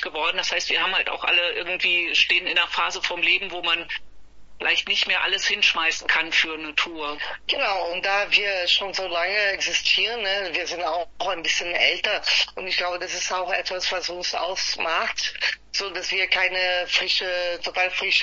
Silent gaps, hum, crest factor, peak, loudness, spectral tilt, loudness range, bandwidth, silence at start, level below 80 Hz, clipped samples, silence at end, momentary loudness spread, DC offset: none; none; 20 dB; -4 dBFS; -22 LUFS; 0 dB/octave; 3 LU; 8 kHz; 0 s; -56 dBFS; under 0.1%; 0 s; 7 LU; under 0.1%